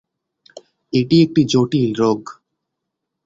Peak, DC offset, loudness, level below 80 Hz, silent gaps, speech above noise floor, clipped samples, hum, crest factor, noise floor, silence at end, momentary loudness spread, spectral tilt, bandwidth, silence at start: -2 dBFS; under 0.1%; -17 LUFS; -56 dBFS; none; 63 dB; under 0.1%; none; 16 dB; -79 dBFS; 0.95 s; 9 LU; -6.5 dB/octave; 7.8 kHz; 0.95 s